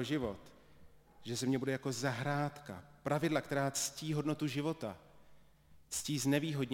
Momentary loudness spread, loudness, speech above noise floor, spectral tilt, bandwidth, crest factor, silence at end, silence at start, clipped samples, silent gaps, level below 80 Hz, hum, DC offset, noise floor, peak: 12 LU; -37 LUFS; 25 dB; -4.5 dB/octave; 16.5 kHz; 18 dB; 0 s; 0 s; under 0.1%; none; -66 dBFS; none; under 0.1%; -62 dBFS; -18 dBFS